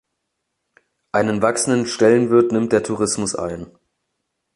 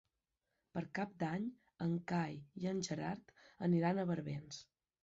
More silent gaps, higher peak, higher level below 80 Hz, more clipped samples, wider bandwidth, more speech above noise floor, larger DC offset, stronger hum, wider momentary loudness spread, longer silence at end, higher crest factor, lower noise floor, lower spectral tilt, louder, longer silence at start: neither; first, -2 dBFS vs -24 dBFS; first, -54 dBFS vs -74 dBFS; neither; first, 11.5 kHz vs 7.8 kHz; first, 59 dB vs 49 dB; neither; neither; second, 9 LU vs 12 LU; first, 0.9 s vs 0.4 s; about the same, 18 dB vs 16 dB; second, -76 dBFS vs -89 dBFS; second, -4.5 dB/octave vs -6.5 dB/octave; first, -18 LUFS vs -41 LUFS; first, 1.15 s vs 0.75 s